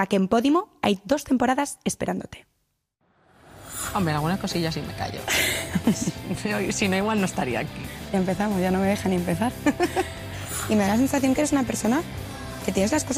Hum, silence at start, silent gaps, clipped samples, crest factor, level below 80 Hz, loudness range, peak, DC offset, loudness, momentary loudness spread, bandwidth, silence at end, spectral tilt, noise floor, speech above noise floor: none; 0 s; none; under 0.1%; 18 dB; -46 dBFS; 4 LU; -6 dBFS; under 0.1%; -24 LUFS; 10 LU; 15.5 kHz; 0 s; -4.5 dB/octave; -74 dBFS; 50 dB